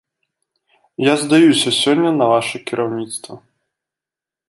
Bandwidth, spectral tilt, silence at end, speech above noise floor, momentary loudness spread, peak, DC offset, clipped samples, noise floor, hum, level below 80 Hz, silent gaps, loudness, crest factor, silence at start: 11.5 kHz; -4 dB/octave; 1.1 s; 73 dB; 16 LU; -2 dBFS; under 0.1%; under 0.1%; -88 dBFS; none; -64 dBFS; none; -15 LUFS; 16 dB; 1 s